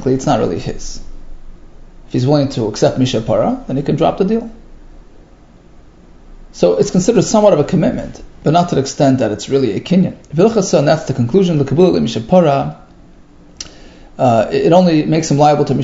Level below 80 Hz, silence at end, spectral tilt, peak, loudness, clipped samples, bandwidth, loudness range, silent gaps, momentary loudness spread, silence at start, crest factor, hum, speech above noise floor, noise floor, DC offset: -36 dBFS; 0 s; -6.5 dB/octave; 0 dBFS; -14 LUFS; under 0.1%; 8 kHz; 5 LU; none; 12 LU; 0 s; 14 dB; none; 29 dB; -42 dBFS; under 0.1%